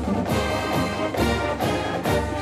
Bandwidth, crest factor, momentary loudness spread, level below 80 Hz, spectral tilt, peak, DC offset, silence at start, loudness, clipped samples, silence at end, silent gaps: 16 kHz; 14 dB; 1 LU; -36 dBFS; -5.5 dB/octave; -10 dBFS; under 0.1%; 0 s; -24 LUFS; under 0.1%; 0 s; none